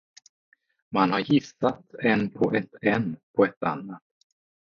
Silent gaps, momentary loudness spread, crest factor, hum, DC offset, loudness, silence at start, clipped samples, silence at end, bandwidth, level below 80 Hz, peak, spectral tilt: 3.23-3.34 s, 3.57-3.61 s; 7 LU; 20 dB; none; under 0.1%; -25 LUFS; 0.9 s; under 0.1%; 0.65 s; 7.2 kHz; -62 dBFS; -6 dBFS; -7 dB/octave